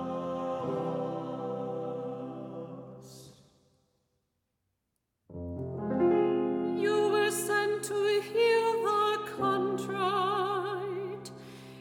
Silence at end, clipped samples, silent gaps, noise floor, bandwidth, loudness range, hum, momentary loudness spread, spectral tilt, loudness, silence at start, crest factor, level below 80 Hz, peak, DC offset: 0 s; under 0.1%; none; -82 dBFS; 19 kHz; 17 LU; none; 17 LU; -5 dB/octave; -30 LUFS; 0 s; 16 dB; -72 dBFS; -16 dBFS; under 0.1%